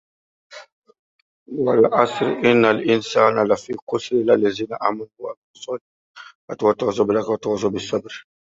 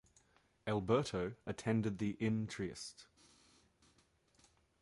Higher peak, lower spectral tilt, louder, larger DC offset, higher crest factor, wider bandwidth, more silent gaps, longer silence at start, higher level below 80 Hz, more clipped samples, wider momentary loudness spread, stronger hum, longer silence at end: first, -2 dBFS vs -22 dBFS; about the same, -5.5 dB/octave vs -6.5 dB/octave; first, -19 LUFS vs -39 LUFS; neither; about the same, 20 dB vs 20 dB; second, 7.8 kHz vs 11.5 kHz; first, 0.72-0.82 s, 0.99-1.46 s, 3.82-3.87 s, 5.37-5.54 s, 5.81-6.14 s, 6.35-6.48 s vs none; second, 0.5 s vs 0.65 s; first, -60 dBFS vs -66 dBFS; neither; first, 17 LU vs 14 LU; neither; second, 0.35 s vs 1.8 s